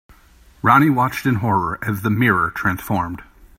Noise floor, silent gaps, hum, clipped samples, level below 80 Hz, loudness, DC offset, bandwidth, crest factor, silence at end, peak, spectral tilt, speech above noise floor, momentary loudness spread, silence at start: -49 dBFS; none; none; under 0.1%; -46 dBFS; -18 LUFS; under 0.1%; 16.5 kHz; 18 dB; 0.35 s; 0 dBFS; -7 dB/octave; 32 dB; 9 LU; 0.65 s